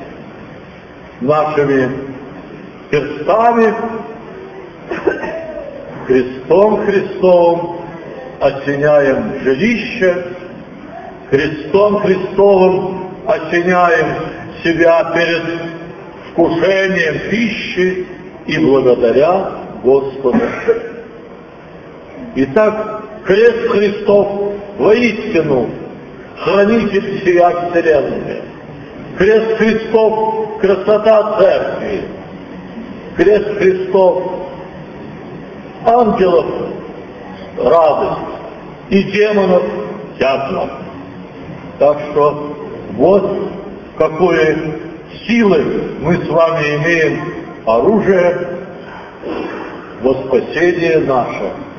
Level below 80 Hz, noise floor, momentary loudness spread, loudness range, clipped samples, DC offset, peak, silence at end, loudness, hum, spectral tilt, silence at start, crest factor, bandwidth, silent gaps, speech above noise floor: -44 dBFS; -34 dBFS; 20 LU; 4 LU; under 0.1%; under 0.1%; 0 dBFS; 0 s; -13 LUFS; none; -7 dB/octave; 0 s; 14 dB; 6.8 kHz; none; 22 dB